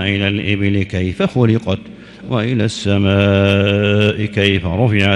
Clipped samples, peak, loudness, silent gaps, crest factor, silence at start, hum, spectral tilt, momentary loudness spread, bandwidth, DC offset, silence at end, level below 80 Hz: under 0.1%; 0 dBFS; -15 LUFS; none; 14 dB; 0 s; none; -6.5 dB/octave; 7 LU; 9.8 kHz; under 0.1%; 0 s; -42 dBFS